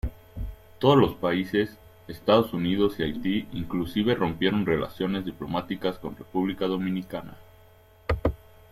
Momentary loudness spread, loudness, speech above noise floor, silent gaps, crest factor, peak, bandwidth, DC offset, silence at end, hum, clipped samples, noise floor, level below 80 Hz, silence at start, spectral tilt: 16 LU; -26 LUFS; 29 dB; none; 20 dB; -6 dBFS; 15.5 kHz; under 0.1%; 0.35 s; none; under 0.1%; -54 dBFS; -44 dBFS; 0.05 s; -7.5 dB/octave